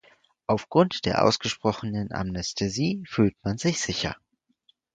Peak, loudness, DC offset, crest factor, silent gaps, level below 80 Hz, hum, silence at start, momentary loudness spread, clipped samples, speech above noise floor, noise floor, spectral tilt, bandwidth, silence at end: -4 dBFS; -26 LUFS; under 0.1%; 22 dB; none; -50 dBFS; none; 0.5 s; 8 LU; under 0.1%; 41 dB; -67 dBFS; -5 dB/octave; 9.4 kHz; 0.8 s